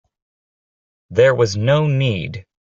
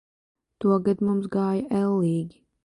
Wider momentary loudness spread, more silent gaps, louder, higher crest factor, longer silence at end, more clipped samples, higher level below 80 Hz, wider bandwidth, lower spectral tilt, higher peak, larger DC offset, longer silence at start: first, 14 LU vs 5 LU; neither; first, -17 LUFS vs -24 LUFS; about the same, 16 dB vs 14 dB; about the same, 0.3 s vs 0.35 s; neither; first, -52 dBFS vs -62 dBFS; second, 7.6 kHz vs 11.5 kHz; second, -6.5 dB/octave vs -9.5 dB/octave; first, -2 dBFS vs -10 dBFS; neither; first, 1.1 s vs 0.6 s